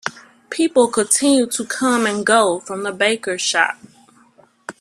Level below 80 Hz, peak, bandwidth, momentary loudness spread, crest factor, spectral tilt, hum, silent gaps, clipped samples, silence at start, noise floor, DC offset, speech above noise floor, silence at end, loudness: -62 dBFS; 0 dBFS; 14.5 kHz; 15 LU; 18 dB; -2 dB/octave; none; none; under 0.1%; 0.05 s; -53 dBFS; under 0.1%; 35 dB; 0.1 s; -17 LUFS